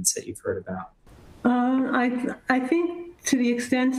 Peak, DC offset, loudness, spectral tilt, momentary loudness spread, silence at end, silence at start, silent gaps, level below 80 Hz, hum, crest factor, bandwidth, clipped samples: -6 dBFS; under 0.1%; -25 LUFS; -3.5 dB/octave; 9 LU; 0 s; 0 s; none; -60 dBFS; none; 20 dB; 16 kHz; under 0.1%